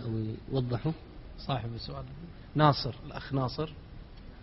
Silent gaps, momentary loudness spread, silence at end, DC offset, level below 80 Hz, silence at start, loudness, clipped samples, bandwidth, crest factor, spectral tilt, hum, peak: none; 23 LU; 0 s; under 0.1%; -48 dBFS; 0 s; -32 LUFS; under 0.1%; 5.8 kHz; 24 dB; -9.5 dB/octave; none; -10 dBFS